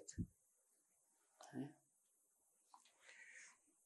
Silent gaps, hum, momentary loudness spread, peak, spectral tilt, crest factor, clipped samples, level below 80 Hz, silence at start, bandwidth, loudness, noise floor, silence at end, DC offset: none; none; 13 LU; -34 dBFS; -5 dB/octave; 24 dB; under 0.1%; -70 dBFS; 0 s; 12 kHz; -56 LUFS; -82 dBFS; 0.15 s; under 0.1%